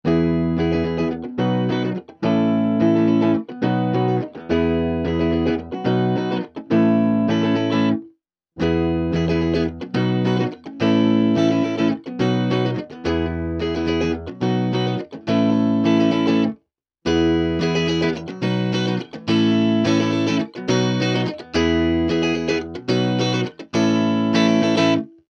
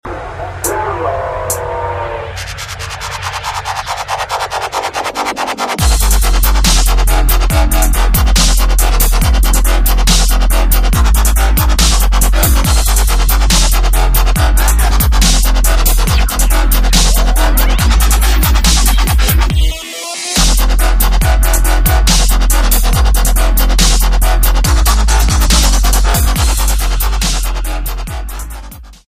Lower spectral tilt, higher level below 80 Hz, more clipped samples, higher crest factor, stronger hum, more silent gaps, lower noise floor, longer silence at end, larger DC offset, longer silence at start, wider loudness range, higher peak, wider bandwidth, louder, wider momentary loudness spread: first, -7 dB/octave vs -3.5 dB/octave; second, -42 dBFS vs -10 dBFS; neither; first, 16 dB vs 10 dB; neither; neither; first, -62 dBFS vs -30 dBFS; about the same, 0.25 s vs 0.15 s; neither; about the same, 0.05 s vs 0.05 s; second, 2 LU vs 7 LU; second, -4 dBFS vs 0 dBFS; second, 7.2 kHz vs 16 kHz; second, -20 LUFS vs -12 LUFS; about the same, 7 LU vs 9 LU